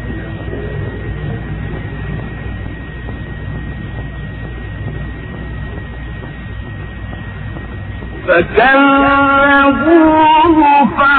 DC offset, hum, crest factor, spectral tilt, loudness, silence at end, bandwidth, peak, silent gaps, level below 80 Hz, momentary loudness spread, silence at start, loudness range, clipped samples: under 0.1%; none; 14 dB; -10 dB/octave; -12 LUFS; 0 s; 4.5 kHz; 0 dBFS; none; -28 dBFS; 18 LU; 0 s; 16 LU; under 0.1%